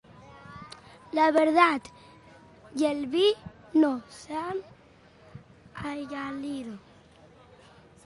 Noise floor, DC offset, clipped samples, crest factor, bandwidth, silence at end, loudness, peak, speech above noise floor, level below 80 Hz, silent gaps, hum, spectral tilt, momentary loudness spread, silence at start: -56 dBFS; under 0.1%; under 0.1%; 22 dB; 11.5 kHz; 1.25 s; -27 LUFS; -6 dBFS; 30 dB; -64 dBFS; none; none; -5 dB/octave; 25 LU; 0.2 s